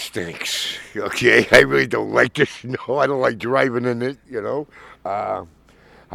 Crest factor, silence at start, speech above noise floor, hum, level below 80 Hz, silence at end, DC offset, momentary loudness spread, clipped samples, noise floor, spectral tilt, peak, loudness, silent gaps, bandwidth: 20 dB; 0 s; 30 dB; none; -50 dBFS; 0 s; under 0.1%; 16 LU; under 0.1%; -50 dBFS; -4 dB/octave; 0 dBFS; -19 LUFS; none; 16.5 kHz